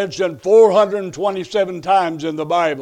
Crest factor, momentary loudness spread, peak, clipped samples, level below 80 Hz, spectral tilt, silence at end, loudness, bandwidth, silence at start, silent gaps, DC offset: 14 dB; 11 LU; -2 dBFS; under 0.1%; -60 dBFS; -5 dB/octave; 0 s; -16 LUFS; 9.8 kHz; 0 s; none; under 0.1%